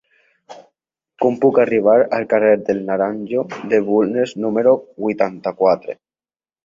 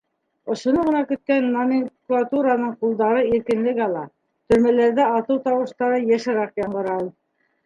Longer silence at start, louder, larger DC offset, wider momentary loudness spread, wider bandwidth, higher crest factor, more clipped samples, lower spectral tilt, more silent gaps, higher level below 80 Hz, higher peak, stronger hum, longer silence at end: about the same, 0.5 s vs 0.45 s; first, -17 LUFS vs -21 LUFS; neither; about the same, 8 LU vs 8 LU; second, 7.4 kHz vs 9.4 kHz; about the same, 16 dB vs 16 dB; neither; about the same, -7.5 dB/octave vs -6.5 dB/octave; neither; second, -62 dBFS vs -56 dBFS; about the same, -2 dBFS vs -4 dBFS; neither; first, 0.7 s vs 0.55 s